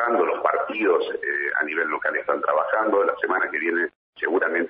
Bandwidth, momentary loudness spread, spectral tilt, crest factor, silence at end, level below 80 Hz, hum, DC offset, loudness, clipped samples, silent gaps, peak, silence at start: 5 kHz; 4 LU; -7.5 dB/octave; 16 dB; 0 s; -72 dBFS; none; under 0.1%; -23 LUFS; under 0.1%; 3.95-4.13 s; -6 dBFS; 0 s